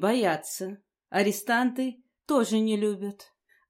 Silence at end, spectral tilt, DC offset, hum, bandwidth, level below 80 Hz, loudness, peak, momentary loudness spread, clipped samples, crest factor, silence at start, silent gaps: 0.45 s; -4.5 dB/octave; under 0.1%; none; 16 kHz; -80 dBFS; -27 LUFS; -10 dBFS; 13 LU; under 0.1%; 16 dB; 0 s; none